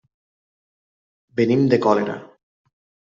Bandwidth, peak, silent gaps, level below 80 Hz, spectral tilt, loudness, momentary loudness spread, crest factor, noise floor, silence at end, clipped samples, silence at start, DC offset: 7.4 kHz; -4 dBFS; none; -66 dBFS; -8 dB/octave; -19 LUFS; 14 LU; 20 dB; under -90 dBFS; 0.9 s; under 0.1%; 1.35 s; under 0.1%